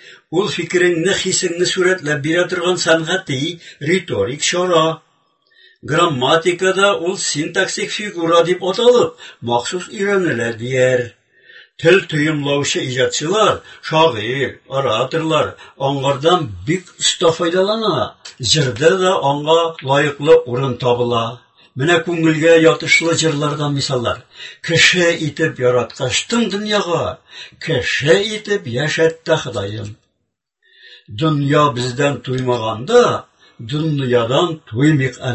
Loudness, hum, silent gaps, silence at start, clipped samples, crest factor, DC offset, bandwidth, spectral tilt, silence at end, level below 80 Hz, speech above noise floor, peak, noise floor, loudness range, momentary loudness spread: -16 LUFS; none; none; 0.05 s; under 0.1%; 16 dB; under 0.1%; 8.6 kHz; -4 dB/octave; 0 s; -50 dBFS; 57 dB; 0 dBFS; -73 dBFS; 3 LU; 9 LU